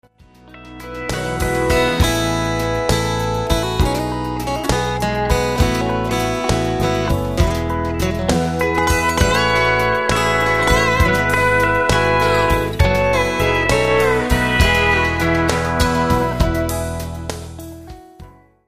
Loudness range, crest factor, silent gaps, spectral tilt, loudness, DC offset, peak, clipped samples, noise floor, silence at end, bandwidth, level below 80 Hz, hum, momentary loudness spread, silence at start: 4 LU; 16 dB; none; -5 dB/octave; -17 LUFS; 0.5%; 0 dBFS; under 0.1%; -46 dBFS; 0.35 s; 15 kHz; -26 dBFS; none; 8 LU; 0.2 s